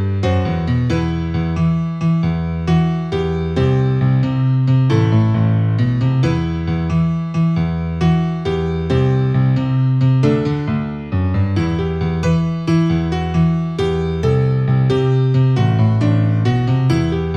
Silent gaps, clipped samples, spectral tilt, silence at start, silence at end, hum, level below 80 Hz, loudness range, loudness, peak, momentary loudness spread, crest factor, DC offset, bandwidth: none; under 0.1%; -8.5 dB/octave; 0 s; 0 s; none; -34 dBFS; 2 LU; -17 LUFS; -2 dBFS; 5 LU; 14 dB; under 0.1%; 7.2 kHz